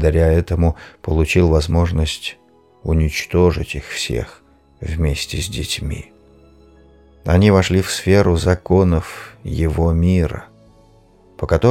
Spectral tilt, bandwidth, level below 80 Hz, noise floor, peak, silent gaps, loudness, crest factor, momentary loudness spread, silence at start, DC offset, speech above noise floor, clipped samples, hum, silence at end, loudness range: -6 dB/octave; 15.5 kHz; -26 dBFS; -50 dBFS; -2 dBFS; none; -17 LUFS; 16 dB; 15 LU; 0 s; under 0.1%; 33 dB; under 0.1%; none; 0 s; 7 LU